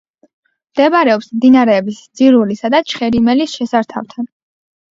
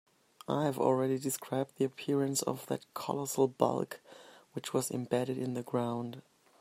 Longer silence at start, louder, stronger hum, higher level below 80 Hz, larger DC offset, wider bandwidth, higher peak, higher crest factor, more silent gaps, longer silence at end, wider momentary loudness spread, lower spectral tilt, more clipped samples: first, 0.75 s vs 0.5 s; first, -13 LUFS vs -34 LUFS; neither; first, -52 dBFS vs -78 dBFS; neither; second, 7.6 kHz vs 16 kHz; first, 0 dBFS vs -12 dBFS; second, 14 dB vs 22 dB; neither; first, 0.7 s vs 0.4 s; about the same, 14 LU vs 12 LU; about the same, -5.5 dB/octave vs -5 dB/octave; neither